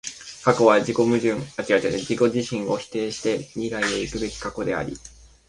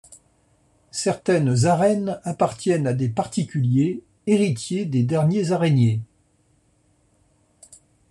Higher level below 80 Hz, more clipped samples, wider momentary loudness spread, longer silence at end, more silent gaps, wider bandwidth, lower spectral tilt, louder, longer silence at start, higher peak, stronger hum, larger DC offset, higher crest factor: first, -50 dBFS vs -60 dBFS; neither; first, 11 LU vs 7 LU; second, 0.4 s vs 2.05 s; neither; about the same, 11.5 kHz vs 11.5 kHz; second, -5 dB/octave vs -6.5 dB/octave; about the same, -23 LUFS vs -22 LUFS; about the same, 0.05 s vs 0.1 s; first, -2 dBFS vs -6 dBFS; neither; neither; about the same, 20 dB vs 16 dB